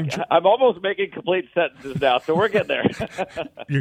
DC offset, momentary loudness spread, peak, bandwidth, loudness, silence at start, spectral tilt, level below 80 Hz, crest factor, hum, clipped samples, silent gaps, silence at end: under 0.1%; 11 LU; -4 dBFS; 14.5 kHz; -21 LUFS; 0 s; -6 dB/octave; -56 dBFS; 18 dB; none; under 0.1%; none; 0 s